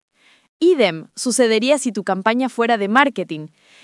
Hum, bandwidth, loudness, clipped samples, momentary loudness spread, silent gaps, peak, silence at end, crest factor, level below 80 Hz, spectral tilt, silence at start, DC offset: none; 12 kHz; -18 LUFS; under 0.1%; 10 LU; none; 0 dBFS; 0.35 s; 18 dB; -74 dBFS; -3.5 dB/octave; 0.6 s; under 0.1%